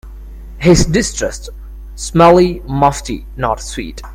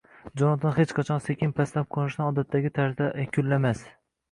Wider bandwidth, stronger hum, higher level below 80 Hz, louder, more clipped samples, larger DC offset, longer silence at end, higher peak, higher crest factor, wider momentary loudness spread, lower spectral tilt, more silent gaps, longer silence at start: first, 16 kHz vs 11 kHz; neither; first, -28 dBFS vs -58 dBFS; first, -13 LUFS vs -26 LUFS; neither; neither; second, 0 s vs 0.4 s; first, 0 dBFS vs -10 dBFS; about the same, 14 dB vs 16 dB; first, 22 LU vs 4 LU; second, -5.5 dB/octave vs -8 dB/octave; neither; second, 0.05 s vs 0.25 s